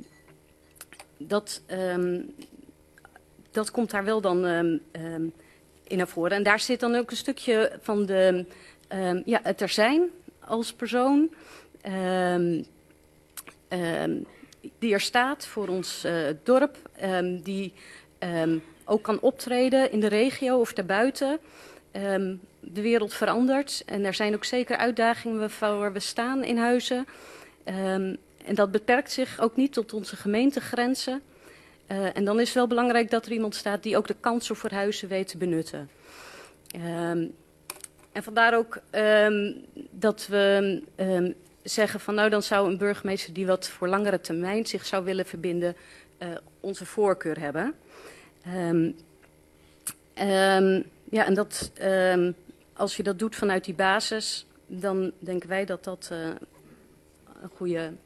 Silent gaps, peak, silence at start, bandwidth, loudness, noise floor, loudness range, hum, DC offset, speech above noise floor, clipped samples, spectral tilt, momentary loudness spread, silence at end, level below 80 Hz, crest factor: none; -4 dBFS; 0 s; 14 kHz; -27 LUFS; -58 dBFS; 5 LU; none; under 0.1%; 32 dB; under 0.1%; -4.5 dB/octave; 15 LU; 0.1 s; -64 dBFS; 24 dB